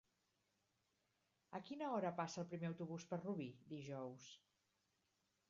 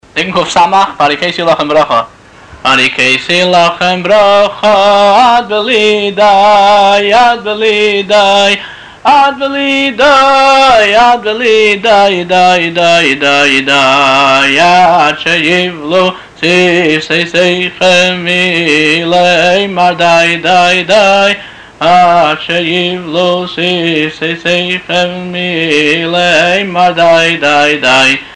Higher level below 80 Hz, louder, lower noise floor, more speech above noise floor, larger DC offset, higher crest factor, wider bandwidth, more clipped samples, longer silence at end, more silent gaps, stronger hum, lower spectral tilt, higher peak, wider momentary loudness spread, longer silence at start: second, -88 dBFS vs -44 dBFS; second, -48 LUFS vs -7 LUFS; first, -86 dBFS vs -33 dBFS; first, 38 dB vs 25 dB; second, under 0.1% vs 0.4%; first, 20 dB vs 8 dB; second, 7.4 kHz vs 10.5 kHz; neither; first, 1.15 s vs 0 s; neither; neither; first, -6 dB/octave vs -3.5 dB/octave; second, -30 dBFS vs 0 dBFS; first, 12 LU vs 6 LU; first, 1.5 s vs 0.15 s